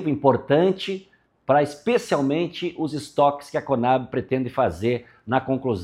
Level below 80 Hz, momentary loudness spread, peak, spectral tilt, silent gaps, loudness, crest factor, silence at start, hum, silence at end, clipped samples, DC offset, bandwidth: -56 dBFS; 9 LU; -2 dBFS; -6.5 dB/octave; none; -23 LUFS; 20 dB; 0 s; none; 0 s; under 0.1%; under 0.1%; 13.5 kHz